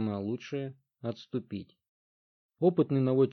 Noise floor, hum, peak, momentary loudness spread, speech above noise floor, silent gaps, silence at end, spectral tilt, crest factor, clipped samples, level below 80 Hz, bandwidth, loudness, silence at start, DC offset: under -90 dBFS; none; -12 dBFS; 16 LU; over 60 dB; 1.88-2.49 s; 0 s; -9 dB/octave; 20 dB; under 0.1%; -78 dBFS; 6.4 kHz; -31 LUFS; 0 s; under 0.1%